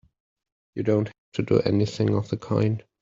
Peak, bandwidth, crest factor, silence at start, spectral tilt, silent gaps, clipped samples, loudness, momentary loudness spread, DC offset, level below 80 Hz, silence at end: -6 dBFS; 7.6 kHz; 18 dB; 0.75 s; -8 dB/octave; 1.18-1.32 s; under 0.1%; -25 LUFS; 9 LU; under 0.1%; -58 dBFS; 0.2 s